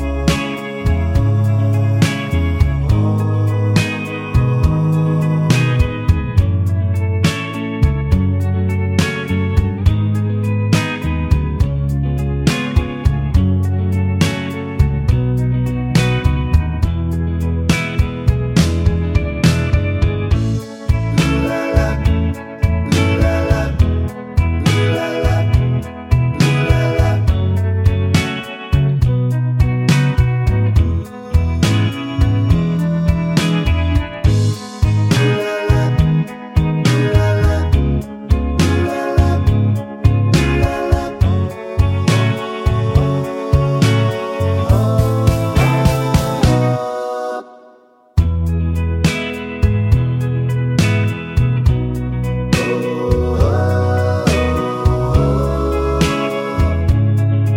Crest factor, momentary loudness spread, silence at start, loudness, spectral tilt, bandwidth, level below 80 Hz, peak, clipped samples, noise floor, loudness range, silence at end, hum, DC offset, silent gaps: 14 dB; 5 LU; 0 s; -16 LUFS; -7 dB/octave; 16.5 kHz; -22 dBFS; 0 dBFS; under 0.1%; -47 dBFS; 2 LU; 0 s; none; under 0.1%; none